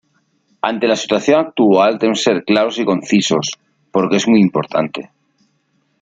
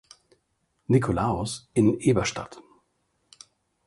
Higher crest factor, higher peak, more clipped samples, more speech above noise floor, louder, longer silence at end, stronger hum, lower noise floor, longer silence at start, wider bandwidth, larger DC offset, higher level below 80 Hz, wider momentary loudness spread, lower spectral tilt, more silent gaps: second, 14 dB vs 20 dB; first, -2 dBFS vs -8 dBFS; neither; about the same, 49 dB vs 49 dB; first, -15 LUFS vs -24 LUFS; second, 0.95 s vs 1.25 s; neither; second, -63 dBFS vs -73 dBFS; second, 0.65 s vs 0.9 s; second, 9 kHz vs 11.5 kHz; neither; second, -60 dBFS vs -48 dBFS; second, 10 LU vs 16 LU; about the same, -5 dB/octave vs -6 dB/octave; neither